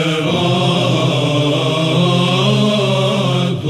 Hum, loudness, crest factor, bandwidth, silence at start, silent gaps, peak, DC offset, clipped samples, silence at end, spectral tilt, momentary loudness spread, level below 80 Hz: none; -14 LUFS; 12 dB; 13 kHz; 0 s; none; -2 dBFS; under 0.1%; under 0.1%; 0 s; -6 dB/octave; 2 LU; -52 dBFS